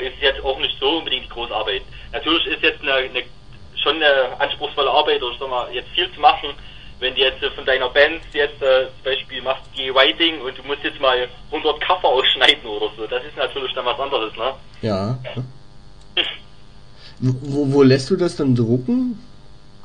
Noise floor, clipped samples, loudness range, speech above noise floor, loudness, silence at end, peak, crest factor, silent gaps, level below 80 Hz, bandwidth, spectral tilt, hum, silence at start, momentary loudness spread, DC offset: -45 dBFS; under 0.1%; 6 LU; 25 dB; -19 LUFS; 0.6 s; 0 dBFS; 20 dB; none; -44 dBFS; 10.5 kHz; -5.5 dB/octave; none; 0 s; 12 LU; 0.9%